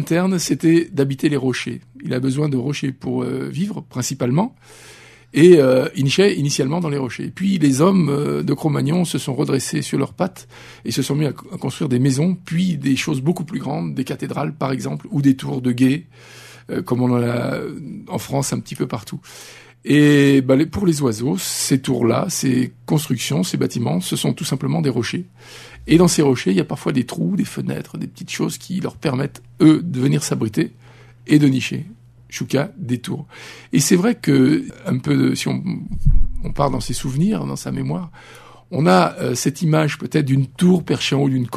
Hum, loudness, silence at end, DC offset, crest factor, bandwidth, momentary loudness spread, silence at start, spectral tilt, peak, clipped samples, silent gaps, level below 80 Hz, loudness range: none; -19 LUFS; 0 s; under 0.1%; 18 dB; 13.5 kHz; 13 LU; 0 s; -5.5 dB/octave; 0 dBFS; under 0.1%; none; -34 dBFS; 5 LU